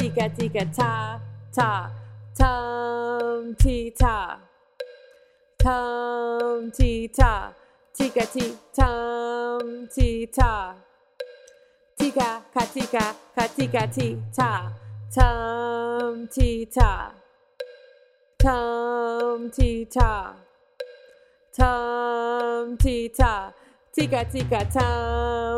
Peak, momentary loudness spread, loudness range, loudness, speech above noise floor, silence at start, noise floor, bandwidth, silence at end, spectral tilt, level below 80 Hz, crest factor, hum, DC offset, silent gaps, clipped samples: 0 dBFS; 17 LU; 2 LU; -25 LUFS; 35 dB; 0 s; -57 dBFS; 15 kHz; 0 s; -6 dB/octave; -28 dBFS; 22 dB; none; under 0.1%; none; under 0.1%